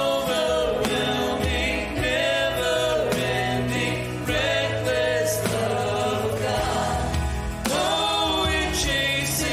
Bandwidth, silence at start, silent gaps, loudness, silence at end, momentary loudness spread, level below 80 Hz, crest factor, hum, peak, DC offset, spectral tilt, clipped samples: 16 kHz; 0 s; none; -23 LUFS; 0 s; 4 LU; -36 dBFS; 16 dB; none; -6 dBFS; under 0.1%; -4 dB/octave; under 0.1%